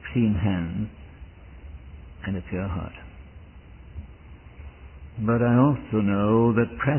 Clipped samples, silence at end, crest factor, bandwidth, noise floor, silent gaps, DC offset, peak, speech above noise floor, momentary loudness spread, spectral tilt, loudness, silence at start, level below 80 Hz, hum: under 0.1%; 0 s; 18 dB; 3.2 kHz; -45 dBFS; none; under 0.1%; -8 dBFS; 23 dB; 25 LU; -12.5 dB/octave; -24 LUFS; 0 s; -42 dBFS; none